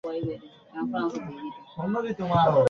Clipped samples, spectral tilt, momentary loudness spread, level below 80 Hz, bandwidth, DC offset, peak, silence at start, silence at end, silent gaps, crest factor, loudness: under 0.1%; -8 dB/octave; 16 LU; -58 dBFS; 7.2 kHz; under 0.1%; -10 dBFS; 0.05 s; 0 s; none; 18 dB; -29 LUFS